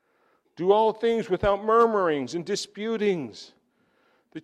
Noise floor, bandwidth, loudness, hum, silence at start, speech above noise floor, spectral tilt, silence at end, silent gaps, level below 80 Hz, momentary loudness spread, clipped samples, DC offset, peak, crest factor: -67 dBFS; 11 kHz; -24 LUFS; none; 0.6 s; 43 dB; -5 dB/octave; 0 s; none; -52 dBFS; 11 LU; under 0.1%; under 0.1%; -8 dBFS; 18 dB